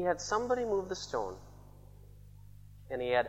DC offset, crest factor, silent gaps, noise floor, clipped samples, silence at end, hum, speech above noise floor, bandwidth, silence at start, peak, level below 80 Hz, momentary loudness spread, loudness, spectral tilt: under 0.1%; 20 dB; none; -54 dBFS; under 0.1%; 0 s; 50 Hz at -55 dBFS; 21 dB; 16 kHz; 0 s; -14 dBFS; -58 dBFS; 24 LU; -34 LUFS; -4 dB/octave